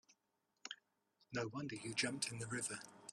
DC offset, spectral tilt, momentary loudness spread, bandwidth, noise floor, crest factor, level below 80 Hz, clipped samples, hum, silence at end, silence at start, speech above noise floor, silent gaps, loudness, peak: under 0.1%; -3 dB/octave; 12 LU; 13 kHz; -86 dBFS; 22 dB; -80 dBFS; under 0.1%; none; 0 s; 0.1 s; 41 dB; none; -44 LUFS; -24 dBFS